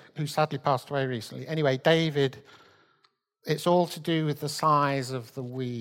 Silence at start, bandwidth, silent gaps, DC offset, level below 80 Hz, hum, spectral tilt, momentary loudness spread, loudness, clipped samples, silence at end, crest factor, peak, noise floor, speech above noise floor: 0.15 s; 16.5 kHz; none; under 0.1%; -70 dBFS; none; -5.5 dB/octave; 11 LU; -27 LUFS; under 0.1%; 0 s; 20 dB; -8 dBFS; -69 dBFS; 42 dB